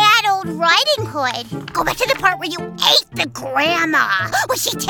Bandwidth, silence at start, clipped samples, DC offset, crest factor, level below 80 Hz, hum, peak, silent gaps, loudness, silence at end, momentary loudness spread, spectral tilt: 19.5 kHz; 0 s; under 0.1%; under 0.1%; 18 dB; -50 dBFS; none; 0 dBFS; none; -16 LUFS; 0 s; 9 LU; -2 dB/octave